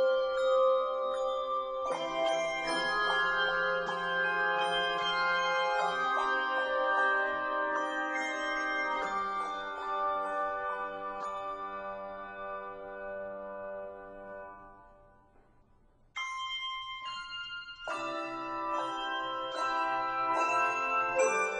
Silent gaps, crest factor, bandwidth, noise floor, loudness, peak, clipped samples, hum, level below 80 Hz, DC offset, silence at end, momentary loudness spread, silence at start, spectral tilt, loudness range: none; 18 dB; 10 kHz; -64 dBFS; -32 LUFS; -16 dBFS; under 0.1%; none; -64 dBFS; under 0.1%; 0 s; 13 LU; 0 s; -2 dB/octave; 13 LU